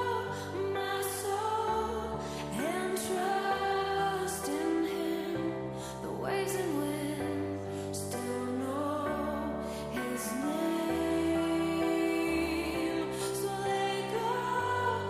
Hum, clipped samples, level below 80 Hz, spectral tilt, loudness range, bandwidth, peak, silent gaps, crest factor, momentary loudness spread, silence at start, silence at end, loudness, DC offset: none; under 0.1%; -56 dBFS; -4.5 dB/octave; 4 LU; 15.5 kHz; -20 dBFS; none; 14 dB; 6 LU; 0 s; 0 s; -33 LUFS; under 0.1%